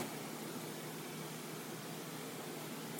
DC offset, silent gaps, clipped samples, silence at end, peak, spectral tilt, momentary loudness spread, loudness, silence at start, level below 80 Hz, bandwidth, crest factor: under 0.1%; none; under 0.1%; 0 s; -18 dBFS; -4 dB/octave; 1 LU; -45 LUFS; 0 s; -88 dBFS; 17 kHz; 28 dB